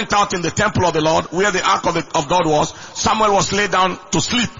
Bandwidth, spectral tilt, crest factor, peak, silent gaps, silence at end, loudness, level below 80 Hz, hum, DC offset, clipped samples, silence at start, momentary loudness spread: 7.6 kHz; -3.5 dB/octave; 14 dB; -2 dBFS; none; 0 s; -17 LUFS; -42 dBFS; none; under 0.1%; under 0.1%; 0 s; 4 LU